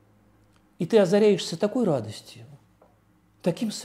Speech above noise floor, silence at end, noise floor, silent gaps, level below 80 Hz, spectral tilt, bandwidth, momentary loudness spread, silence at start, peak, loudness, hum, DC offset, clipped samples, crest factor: 38 dB; 0 s; -62 dBFS; none; -70 dBFS; -6 dB/octave; 14.5 kHz; 18 LU; 0.8 s; -8 dBFS; -24 LUFS; none; under 0.1%; under 0.1%; 18 dB